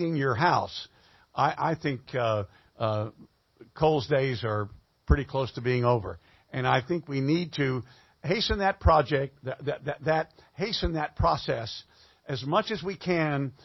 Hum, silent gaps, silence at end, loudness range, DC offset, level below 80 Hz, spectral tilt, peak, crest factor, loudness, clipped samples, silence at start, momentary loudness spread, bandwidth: none; none; 0.1 s; 3 LU; under 0.1%; -40 dBFS; -6.5 dB/octave; -8 dBFS; 20 dB; -28 LUFS; under 0.1%; 0 s; 14 LU; 6.2 kHz